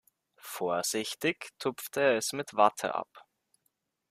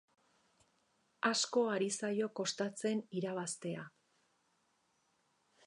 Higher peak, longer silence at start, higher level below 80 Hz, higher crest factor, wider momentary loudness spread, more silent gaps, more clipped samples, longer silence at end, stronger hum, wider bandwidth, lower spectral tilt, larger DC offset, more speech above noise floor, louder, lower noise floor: first, -8 dBFS vs -20 dBFS; second, 0.45 s vs 1.25 s; first, -80 dBFS vs under -90 dBFS; about the same, 24 dB vs 20 dB; first, 12 LU vs 9 LU; neither; neither; second, 0.9 s vs 1.8 s; neither; first, 15.5 kHz vs 11 kHz; about the same, -2.5 dB/octave vs -3.5 dB/octave; neither; first, 48 dB vs 41 dB; first, -30 LUFS vs -37 LUFS; about the same, -79 dBFS vs -78 dBFS